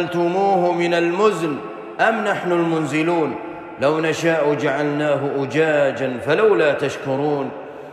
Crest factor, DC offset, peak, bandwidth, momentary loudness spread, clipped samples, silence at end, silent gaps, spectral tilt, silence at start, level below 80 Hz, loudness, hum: 16 dB; under 0.1%; -4 dBFS; 13 kHz; 8 LU; under 0.1%; 0 s; none; -6 dB/octave; 0 s; -64 dBFS; -19 LUFS; none